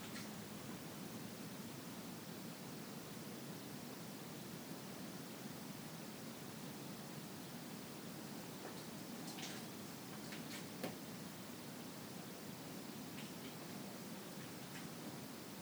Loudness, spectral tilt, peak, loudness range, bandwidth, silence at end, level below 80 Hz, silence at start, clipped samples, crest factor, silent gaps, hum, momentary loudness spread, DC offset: -50 LUFS; -4 dB/octave; -30 dBFS; 1 LU; over 20 kHz; 0 s; -80 dBFS; 0 s; under 0.1%; 20 dB; none; none; 2 LU; under 0.1%